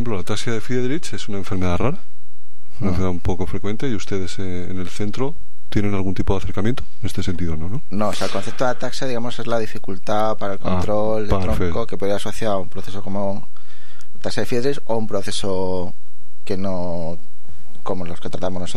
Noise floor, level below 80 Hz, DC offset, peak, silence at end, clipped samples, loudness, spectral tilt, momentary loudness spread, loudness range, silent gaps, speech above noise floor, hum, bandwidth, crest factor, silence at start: -56 dBFS; -36 dBFS; 30%; -2 dBFS; 0 s; under 0.1%; -25 LUFS; -6 dB/octave; 8 LU; 3 LU; none; 32 dB; none; 15 kHz; 18 dB; 0 s